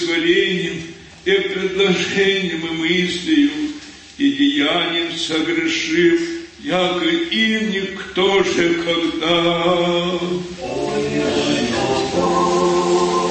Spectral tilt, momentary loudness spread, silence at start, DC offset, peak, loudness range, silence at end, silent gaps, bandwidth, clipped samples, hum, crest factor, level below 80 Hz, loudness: -4.5 dB/octave; 8 LU; 0 s; under 0.1%; -4 dBFS; 1 LU; 0 s; none; 8.8 kHz; under 0.1%; none; 14 dB; -48 dBFS; -18 LUFS